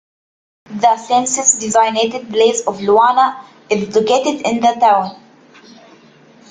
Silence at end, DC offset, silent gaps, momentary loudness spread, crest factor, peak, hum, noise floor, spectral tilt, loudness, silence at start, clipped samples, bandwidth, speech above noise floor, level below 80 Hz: 1.35 s; under 0.1%; none; 7 LU; 16 dB; 0 dBFS; none; -45 dBFS; -2.5 dB/octave; -14 LUFS; 0.7 s; under 0.1%; 9.8 kHz; 31 dB; -60 dBFS